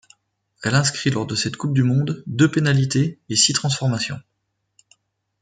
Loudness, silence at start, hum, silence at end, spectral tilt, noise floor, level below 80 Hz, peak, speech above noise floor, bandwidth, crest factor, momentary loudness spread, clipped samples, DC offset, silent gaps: -20 LUFS; 0.6 s; none; 1.2 s; -4 dB/octave; -74 dBFS; -58 dBFS; -4 dBFS; 55 dB; 9.4 kHz; 18 dB; 9 LU; under 0.1%; under 0.1%; none